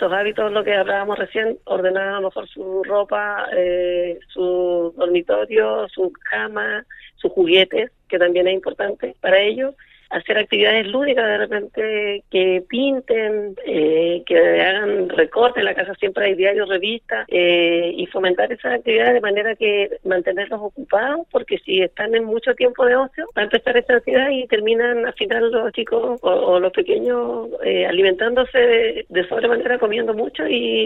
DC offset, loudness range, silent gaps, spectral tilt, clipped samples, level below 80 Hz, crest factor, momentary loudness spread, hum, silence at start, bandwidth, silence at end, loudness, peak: under 0.1%; 3 LU; none; -6.5 dB/octave; under 0.1%; -54 dBFS; 18 dB; 8 LU; none; 0 s; 4.1 kHz; 0 s; -19 LUFS; -2 dBFS